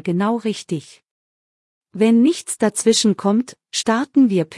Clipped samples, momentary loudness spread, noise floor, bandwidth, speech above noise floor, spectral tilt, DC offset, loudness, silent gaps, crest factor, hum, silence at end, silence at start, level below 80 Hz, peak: under 0.1%; 11 LU; under -90 dBFS; 12 kHz; over 72 dB; -4.5 dB/octave; under 0.1%; -18 LUFS; 1.11-1.81 s; 16 dB; none; 0 s; 0.05 s; -68 dBFS; -2 dBFS